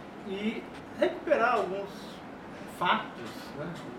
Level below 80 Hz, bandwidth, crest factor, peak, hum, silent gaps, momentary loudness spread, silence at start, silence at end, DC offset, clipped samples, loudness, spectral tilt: -64 dBFS; 16.5 kHz; 20 dB; -12 dBFS; none; none; 17 LU; 0 s; 0 s; under 0.1%; under 0.1%; -31 LUFS; -5.5 dB/octave